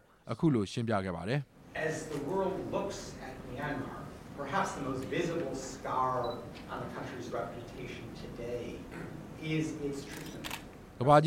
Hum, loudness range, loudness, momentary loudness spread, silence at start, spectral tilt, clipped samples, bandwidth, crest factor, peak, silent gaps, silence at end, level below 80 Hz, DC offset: none; 5 LU; -36 LUFS; 11 LU; 0.25 s; -6 dB/octave; under 0.1%; 16 kHz; 24 dB; -10 dBFS; none; 0 s; -58 dBFS; under 0.1%